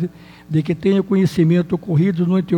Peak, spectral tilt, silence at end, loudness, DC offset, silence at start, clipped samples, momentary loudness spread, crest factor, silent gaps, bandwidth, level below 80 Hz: -6 dBFS; -8.5 dB/octave; 0 s; -18 LUFS; under 0.1%; 0 s; under 0.1%; 6 LU; 12 dB; none; 10.5 kHz; -50 dBFS